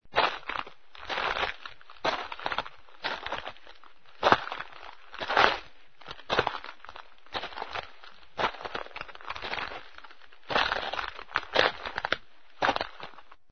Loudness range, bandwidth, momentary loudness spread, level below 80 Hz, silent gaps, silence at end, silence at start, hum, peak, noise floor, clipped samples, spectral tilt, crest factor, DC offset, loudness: 7 LU; 6.6 kHz; 21 LU; -56 dBFS; none; 0.3 s; 0 s; none; -2 dBFS; -56 dBFS; under 0.1%; -3.5 dB/octave; 32 dB; 0.5%; -30 LUFS